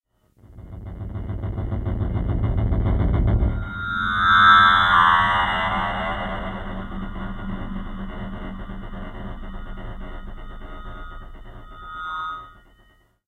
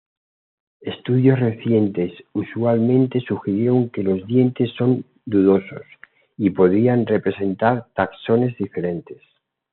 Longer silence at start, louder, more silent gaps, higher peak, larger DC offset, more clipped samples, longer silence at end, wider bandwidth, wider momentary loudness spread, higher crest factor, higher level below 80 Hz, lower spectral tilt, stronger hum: second, 0.5 s vs 0.85 s; about the same, -20 LUFS vs -20 LUFS; neither; about the same, -2 dBFS vs -2 dBFS; neither; neither; about the same, 0.7 s vs 0.6 s; first, 9.2 kHz vs 4.2 kHz; first, 24 LU vs 10 LU; first, 22 dB vs 16 dB; first, -30 dBFS vs -66 dBFS; about the same, -6.5 dB/octave vs -7.5 dB/octave; neither